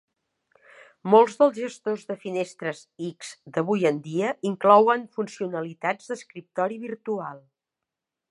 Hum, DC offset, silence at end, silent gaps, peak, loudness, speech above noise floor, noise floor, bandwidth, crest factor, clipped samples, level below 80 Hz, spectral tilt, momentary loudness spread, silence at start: none; under 0.1%; 0.95 s; none; -4 dBFS; -24 LUFS; 63 dB; -87 dBFS; 11 kHz; 22 dB; under 0.1%; -78 dBFS; -6 dB/octave; 17 LU; 1.05 s